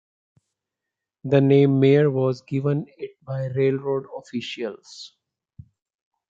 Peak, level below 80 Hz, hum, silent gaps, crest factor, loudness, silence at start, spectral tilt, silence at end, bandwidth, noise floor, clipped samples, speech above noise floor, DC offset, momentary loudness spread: -4 dBFS; -66 dBFS; none; none; 20 dB; -22 LUFS; 1.25 s; -8 dB/octave; 1.2 s; 7.6 kHz; -86 dBFS; under 0.1%; 64 dB; under 0.1%; 21 LU